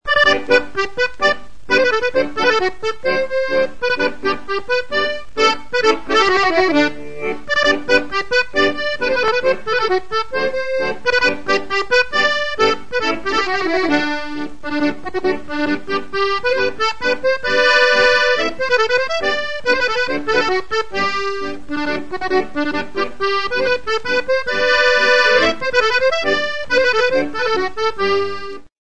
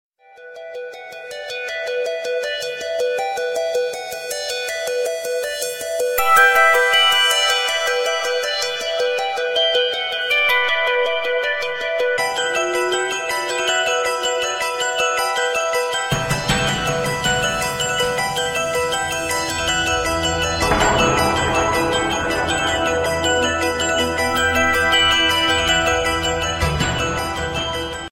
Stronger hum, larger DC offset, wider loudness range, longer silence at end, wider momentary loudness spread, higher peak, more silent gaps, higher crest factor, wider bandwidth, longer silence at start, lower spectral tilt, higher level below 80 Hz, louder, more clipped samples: neither; first, 4% vs under 0.1%; about the same, 5 LU vs 7 LU; about the same, 0 s vs 0.05 s; about the same, 9 LU vs 9 LU; about the same, 0 dBFS vs -2 dBFS; neither; about the same, 18 dB vs 18 dB; second, 10 kHz vs 16.5 kHz; second, 0 s vs 0.4 s; about the same, -3 dB/octave vs -2.5 dB/octave; second, -44 dBFS vs -38 dBFS; about the same, -17 LUFS vs -18 LUFS; neither